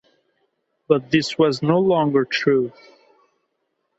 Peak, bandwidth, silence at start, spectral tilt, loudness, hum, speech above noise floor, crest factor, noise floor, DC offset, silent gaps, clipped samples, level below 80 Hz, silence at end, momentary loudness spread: -2 dBFS; 8.2 kHz; 0.9 s; -6 dB/octave; -19 LUFS; none; 55 dB; 18 dB; -73 dBFS; under 0.1%; none; under 0.1%; -64 dBFS; 1.3 s; 4 LU